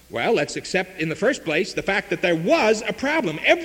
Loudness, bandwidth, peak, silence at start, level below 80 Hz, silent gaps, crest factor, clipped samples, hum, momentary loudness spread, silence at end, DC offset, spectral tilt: -22 LUFS; 17 kHz; -2 dBFS; 0.1 s; -54 dBFS; none; 20 dB; under 0.1%; none; 5 LU; 0 s; under 0.1%; -4.5 dB/octave